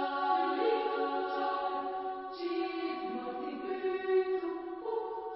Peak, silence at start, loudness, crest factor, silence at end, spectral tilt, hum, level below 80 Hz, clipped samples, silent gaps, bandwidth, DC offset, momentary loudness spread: -20 dBFS; 0 s; -34 LUFS; 14 dB; 0 s; -1 dB/octave; none; -76 dBFS; under 0.1%; none; 5.6 kHz; under 0.1%; 8 LU